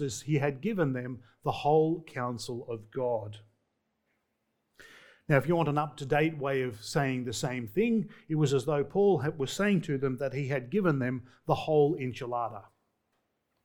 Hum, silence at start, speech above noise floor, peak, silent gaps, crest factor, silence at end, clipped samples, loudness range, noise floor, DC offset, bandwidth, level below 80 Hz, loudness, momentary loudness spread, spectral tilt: none; 0 s; 50 dB; -8 dBFS; none; 22 dB; 1.05 s; under 0.1%; 4 LU; -79 dBFS; under 0.1%; 19 kHz; -60 dBFS; -30 LUFS; 11 LU; -6.5 dB/octave